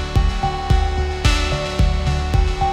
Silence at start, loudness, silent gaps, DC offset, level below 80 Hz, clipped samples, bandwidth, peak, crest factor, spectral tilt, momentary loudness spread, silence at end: 0 s; -20 LUFS; none; under 0.1%; -20 dBFS; under 0.1%; 12 kHz; -2 dBFS; 16 dB; -5.5 dB/octave; 3 LU; 0 s